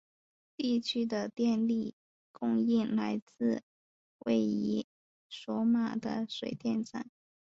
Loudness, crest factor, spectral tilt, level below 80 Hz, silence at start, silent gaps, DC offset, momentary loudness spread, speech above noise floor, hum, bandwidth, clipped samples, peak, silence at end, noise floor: -33 LUFS; 16 dB; -6 dB/octave; -74 dBFS; 0.6 s; 1.93-2.34 s, 3.22-3.27 s, 3.63-4.19 s, 4.84-5.30 s; under 0.1%; 12 LU; over 59 dB; none; 7.6 kHz; under 0.1%; -16 dBFS; 0.4 s; under -90 dBFS